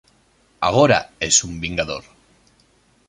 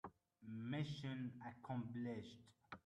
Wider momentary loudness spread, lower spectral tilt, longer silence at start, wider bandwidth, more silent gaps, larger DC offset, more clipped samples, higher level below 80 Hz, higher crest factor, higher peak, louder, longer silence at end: second, 11 LU vs 15 LU; second, -3 dB/octave vs -7 dB/octave; first, 0.6 s vs 0.05 s; first, 11.5 kHz vs 10 kHz; neither; neither; neither; first, -46 dBFS vs -80 dBFS; about the same, 20 dB vs 16 dB; first, -2 dBFS vs -34 dBFS; first, -18 LUFS vs -49 LUFS; first, 1.05 s vs 0.1 s